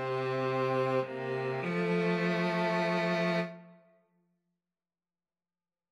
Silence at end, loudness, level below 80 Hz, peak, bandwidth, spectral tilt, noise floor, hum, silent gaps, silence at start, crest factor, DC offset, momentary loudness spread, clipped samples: 2.15 s; -31 LUFS; -80 dBFS; -18 dBFS; 10.5 kHz; -7 dB/octave; under -90 dBFS; none; none; 0 s; 14 dB; under 0.1%; 5 LU; under 0.1%